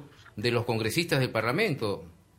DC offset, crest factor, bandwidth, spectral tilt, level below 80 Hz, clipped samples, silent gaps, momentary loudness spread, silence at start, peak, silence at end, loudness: under 0.1%; 20 dB; 16 kHz; -5 dB/octave; -60 dBFS; under 0.1%; none; 8 LU; 0 s; -10 dBFS; 0.25 s; -28 LUFS